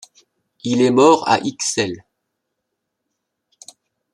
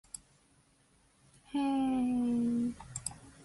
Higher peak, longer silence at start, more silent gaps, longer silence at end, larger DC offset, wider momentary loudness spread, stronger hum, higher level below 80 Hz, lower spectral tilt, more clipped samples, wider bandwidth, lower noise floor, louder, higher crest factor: first, -2 dBFS vs -18 dBFS; second, 0.65 s vs 1.5 s; neither; first, 2.15 s vs 0 s; neither; about the same, 14 LU vs 12 LU; neither; about the same, -64 dBFS vs -62 dBFS; about the same, -4 dB/octave vs -5 dB/octave; neither; about the same, 12.5 kHz vs 11.5 kHz; first, -77 dBFS vs -68 dBFS; first, -16 LUFS vs -33 LUFS; about the same, 20 dB vs 18 dB